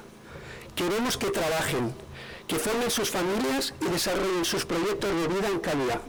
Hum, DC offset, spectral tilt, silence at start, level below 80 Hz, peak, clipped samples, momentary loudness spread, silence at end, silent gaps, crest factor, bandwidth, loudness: none; under 0.1%; -3.5 dB/octave; 0 s; -50 dBFS; -20 dBFS; under 0.1%; 14 LU; 0 s; none; 8 dB; over 20 kHz; -27 LUFS